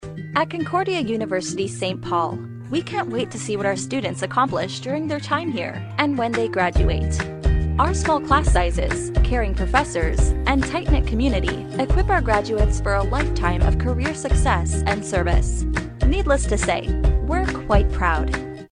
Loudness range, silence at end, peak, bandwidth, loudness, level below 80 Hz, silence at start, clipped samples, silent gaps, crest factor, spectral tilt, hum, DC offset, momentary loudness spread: 4 LU; 0.05 s; -2 dBFS; 10.5 kHz; -22 LUFS; -24 dBFS; 0 s; under 0.1%; none; 18 dB; -5.5 dB/octave; none; under 0.1%; 6 LU